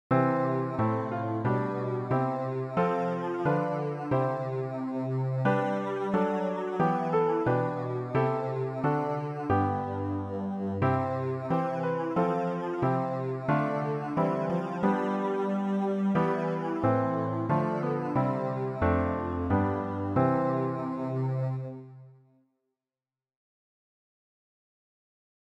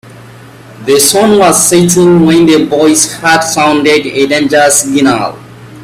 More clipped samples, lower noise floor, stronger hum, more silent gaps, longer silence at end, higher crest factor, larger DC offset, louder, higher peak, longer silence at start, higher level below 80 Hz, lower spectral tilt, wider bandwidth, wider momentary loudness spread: second, under 0.1% vs 0.3%; first, under -90 dBFS vs -32 dBFS; neither; neither; first, 3.35 s vs 0 s; first, 16 dB vs 8 dB; neither; second, -29 LUFS vs -7 LUFS; second, -12 dBFS vs 0 dBFS; about the same, 0.1 s vs 0.1 s; second, -56 dBFS vs -44 dBFS; first, -9.5 dB/octave vs -3.5 dB/octave; second, 7.8 kHz vs over 20 kHz; about the same, 5 LU vs 5 LU